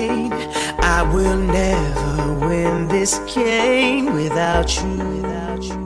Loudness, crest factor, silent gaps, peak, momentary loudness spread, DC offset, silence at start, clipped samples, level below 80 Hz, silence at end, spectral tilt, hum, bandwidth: -19 LUFS; 14 dB; none; -4 dBFS; 7 LU; under 0.1%; 0 s; under 0.1%; -26 dBFS; 0 s; -4.5 dB/octave; none; 13 kHz